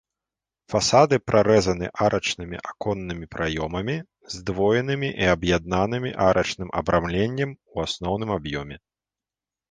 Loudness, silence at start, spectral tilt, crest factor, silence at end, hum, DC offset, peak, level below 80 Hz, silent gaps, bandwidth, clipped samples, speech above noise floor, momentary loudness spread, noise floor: -23 LUFS; 0.7 s; -5 dB/octave; 22 dB; 0.95 s; none; under 0.1%; -2 dBFS; -44 dBFS; none; 10 kHz; under 0.1%; over 67 dB; 12 LU; under -90 dBFS